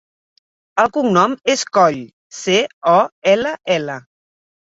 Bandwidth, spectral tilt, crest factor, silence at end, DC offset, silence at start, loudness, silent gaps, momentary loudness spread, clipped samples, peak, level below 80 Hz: 8 kHz; -4 dB/octave; 16 dB; 0.75 s; under 0.1%; 0.75 s; -16 LUFS; 2.13-2.30 s, 2.73-2.81 s, 3.12-3.22 s; 12 LU; under 0.1%; 0 dBFS; -60 dBFS